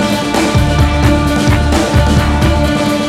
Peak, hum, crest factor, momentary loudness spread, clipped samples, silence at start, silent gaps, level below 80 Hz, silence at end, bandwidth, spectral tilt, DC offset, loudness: 0 dBFS; none; 10 dB; 2 LU; under 0.1%; 0 s; none; -16 dBFS; 0 s; 15 kHz; -5.5 dB/octave; under 0.1%; -12 LUFS